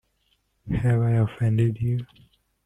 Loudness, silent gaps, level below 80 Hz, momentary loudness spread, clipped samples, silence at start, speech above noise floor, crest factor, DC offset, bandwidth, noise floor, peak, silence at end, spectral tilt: -24 LUFS; none; -46 dBFS; 9 LU; under 0.1%; 0.65 s; 47 dB; 14 dB; under 0.1%; 3.7 kHz; -69 dBFS; -10 dBFS; 0.6 s; -9.5 dB/octave